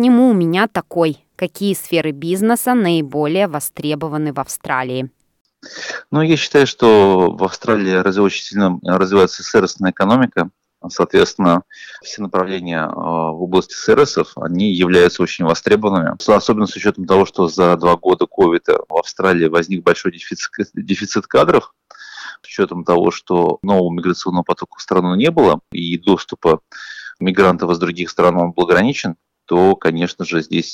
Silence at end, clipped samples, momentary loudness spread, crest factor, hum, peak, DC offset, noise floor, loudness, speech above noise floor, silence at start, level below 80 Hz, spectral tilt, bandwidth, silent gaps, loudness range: 0 s; under 0.1%; 11 LU; 14 dB; none; -2 dBFS; under 0.1%; -34 dBFS; -15 LUFS; 19 dB; 0 s; -52 dBFS; -5.5 dB/octave; 17.5 kHz; 5.41-5.45 s; 4 LU